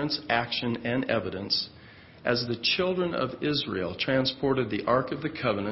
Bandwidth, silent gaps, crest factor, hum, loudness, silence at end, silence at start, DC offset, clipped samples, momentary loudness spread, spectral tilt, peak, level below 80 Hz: 6 kHz; none; 20 dB; none; -28 LUFS; 0 s; 0 s; under 0.1%; under 0.1%; 4 LU; -8.5 dB/octave; -8 dBFS; -56 dBFS